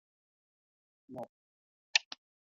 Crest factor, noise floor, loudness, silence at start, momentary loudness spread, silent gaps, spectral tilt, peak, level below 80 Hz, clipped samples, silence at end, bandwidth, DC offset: 32 dB; under -90 dBFS; -32 LUFS; 1.1 s; 19 LU; 1.29-1.94 s; 1.5 dB/octave; -10 dBFS; under -90 dBFS; under 0.1%; 0.5 s; 7.2 kHz; under 0.1%